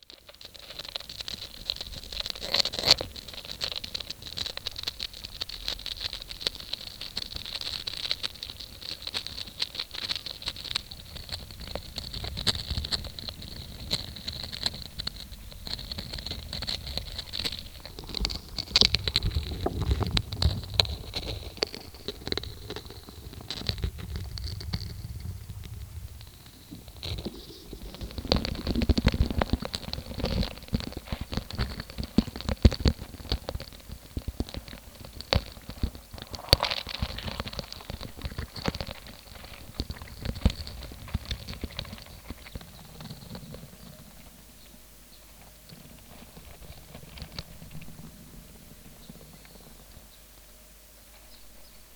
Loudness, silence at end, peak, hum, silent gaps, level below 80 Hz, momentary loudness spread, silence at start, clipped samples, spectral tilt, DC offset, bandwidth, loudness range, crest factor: -31 LUFS; 0 s; 0 dBFS; none; none; -40 dBFS; 22 LU; 0.1 s; under 0.1%; -4 dB/octave; under 0.1%; over 20 kHz; 18 LU; 34 dB